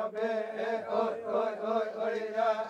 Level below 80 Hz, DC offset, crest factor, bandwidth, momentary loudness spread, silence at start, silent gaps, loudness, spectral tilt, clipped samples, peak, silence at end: -86 dBFS; under 0.1%; 14 dB; 9.2 kHz; 3 LU; 0 s; none; -32 LUFS; -5.5 dB/octave; under 0.1%; -18 dBFS; 0 s